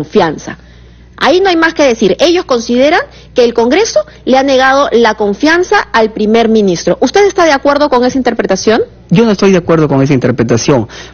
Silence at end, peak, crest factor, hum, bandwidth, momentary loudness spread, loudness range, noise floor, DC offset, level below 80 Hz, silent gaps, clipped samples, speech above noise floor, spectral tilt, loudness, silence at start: 0.05 s; 0 dBFS; 10 dB; none; 7.2 kHz; 5 LU; 1 LU; -36 dBFS; under 0.1%; -38 dBFS; none; 0.3%; 27 dB; -5 dB/octave; -9 LUFS; 0 s